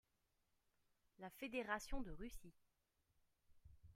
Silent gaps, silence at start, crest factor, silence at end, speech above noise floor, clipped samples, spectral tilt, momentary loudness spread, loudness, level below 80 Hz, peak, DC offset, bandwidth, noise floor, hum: none; 1.2 s; 24 dB; 0 s; 37 dB; under 0.1%; -4 dB/octave; 16 LU; -50 LUFS; -62 dBFS; -28 dBFS; under 0.1%; 15.5 kHz; -86 dBFS; none